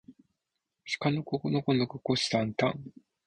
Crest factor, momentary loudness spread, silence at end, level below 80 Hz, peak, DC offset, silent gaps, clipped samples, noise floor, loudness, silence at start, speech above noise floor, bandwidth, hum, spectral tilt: 20 dB; 13 LU; 0.35 s; -66 dBFS; -12 dBFS; under 0.1%; none; under 0.1%; -85 dBFS; -30 LUFS; 0.1 s; 55 dB; 10.5 kHz; none; -5.5 dB/octave